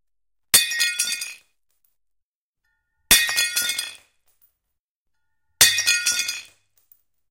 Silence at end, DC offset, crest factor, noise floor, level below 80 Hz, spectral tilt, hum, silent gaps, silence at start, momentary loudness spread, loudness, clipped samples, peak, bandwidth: 0.9 s; under 0.1%; 24 dB; -85 dBFS; -52 dBFS; 2 dB/octave; none; 2.22-2.54 s, 4.79-5.05 s; 0.55 s; 13 LU; -18 LUFS; under 0.1%; 0 dBFS; 17 kHz